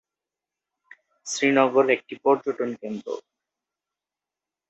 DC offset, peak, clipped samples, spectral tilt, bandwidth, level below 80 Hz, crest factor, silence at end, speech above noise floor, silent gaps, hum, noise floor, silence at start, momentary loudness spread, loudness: under 0.1%; -4 dBFS; under 0.1%; -4 dB/octave; 8.2 kHz; -76 dBFS; 22 dB; 1.5 s; 66 dB; none; none; -89 dBFS; 1.25 s; 16 LU; -23 LUFS